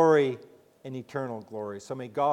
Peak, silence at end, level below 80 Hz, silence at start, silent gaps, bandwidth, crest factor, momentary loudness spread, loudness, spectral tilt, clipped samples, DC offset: -10 dBFS; 0 s; -78 dBFS; 0 s; none; 9.8 kHz; 18 dB; 17 LU; -31 LUFS; -6.5 dB/octave; under 0.1%; under 0.1%